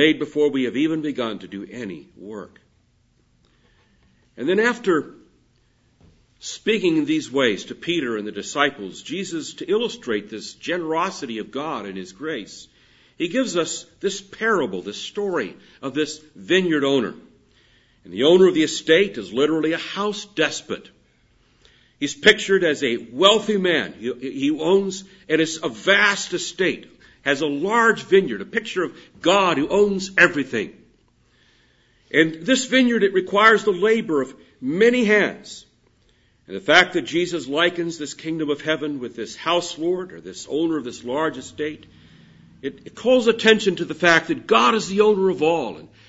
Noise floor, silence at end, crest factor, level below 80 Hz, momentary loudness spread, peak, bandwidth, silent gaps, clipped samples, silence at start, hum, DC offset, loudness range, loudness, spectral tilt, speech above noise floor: -62 dBFS; 0.2 s; 22 dB; -62 dBFS; 16 LU; 0 dBFS; 8 kHz; none; under 0.1%; 0 s; none; under 0.1%; 8 LU; -20 LUFS; -4 dB/octave; 41 dB